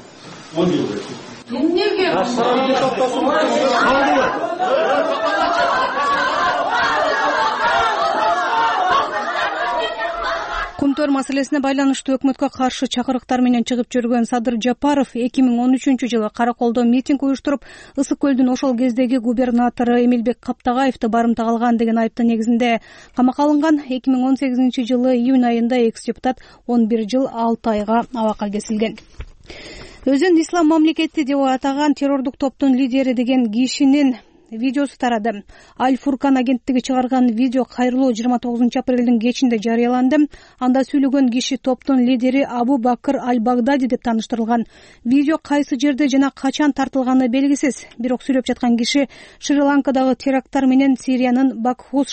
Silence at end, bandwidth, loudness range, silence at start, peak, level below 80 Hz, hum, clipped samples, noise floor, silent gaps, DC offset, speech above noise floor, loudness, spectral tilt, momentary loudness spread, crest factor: 0 s; 8.8 kHz; 2 LU; 0 s; -6 dBFS; -50 dBFS; none; under 0.1%; -38 dBFS; none; under 0.1%; 21 dB; -18 LUFS; -4.5 dB/octave; 7 LU; 12 dB